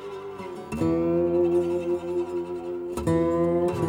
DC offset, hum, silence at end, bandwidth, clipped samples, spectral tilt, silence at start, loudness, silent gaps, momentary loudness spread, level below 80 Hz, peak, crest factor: under 0.1%; none; 0 s; 11.5 kHz; under 0.1%; -8 dB/octave; 0 s; -25 LUFS; none; 13 LU; -52 dBFS; -12 dBFS; 12 dB